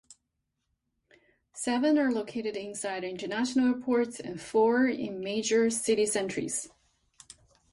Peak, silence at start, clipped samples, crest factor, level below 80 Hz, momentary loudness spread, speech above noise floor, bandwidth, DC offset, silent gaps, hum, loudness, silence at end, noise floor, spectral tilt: -14 dBFS; 0.1 s; under 0.1%; 16 dB; -70 dBFS; 10 LU; 53 dB; 11.5 kHz; under 0.1%; none; none; -29 LUFS; 1.05 s; -82 dBFS; -3.5 dB/octave